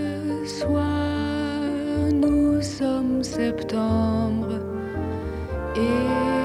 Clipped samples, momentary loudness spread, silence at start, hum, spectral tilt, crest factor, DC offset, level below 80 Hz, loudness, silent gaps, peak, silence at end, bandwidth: under 0.1%; 8 LU; 0 s; none; -6.5 dB/octave; 12 dB; under 0.1%; -40 dBFS; -24 LUFS; none; -10 dBFS; 0 s; 12 kHz